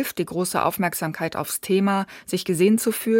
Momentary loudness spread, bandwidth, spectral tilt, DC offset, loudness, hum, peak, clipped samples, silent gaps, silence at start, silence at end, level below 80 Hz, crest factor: 8 LU; 17 kHz; -5 dB/octave; under 0.1%; -23 LUFS; none; -8 dBFS; under 0.1%; none; 0 s; 0 s; -64 dBFS; 16 dB